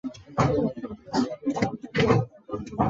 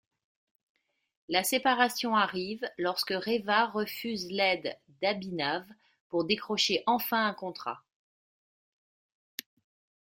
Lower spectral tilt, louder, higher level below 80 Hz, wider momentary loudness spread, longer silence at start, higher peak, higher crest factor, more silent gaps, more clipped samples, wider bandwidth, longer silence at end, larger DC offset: first, -7 dB/octave vs -3 dB/octave; first, -27 LUFS vs -30 LUFS; first, -48 dBFS vs -76 dBFS; about the same, 12 LU vs 13 LU; second, 0.05 s vs 1.3 s; about the same, -8 dBFS vs -8 dBFS; second, 18 dB vs 24 dB; second, none vs 6.00-6.10 s; neither; second, 7.8 kHz vs 16.5 kHz; second, 0 s vs 2.3 s; neither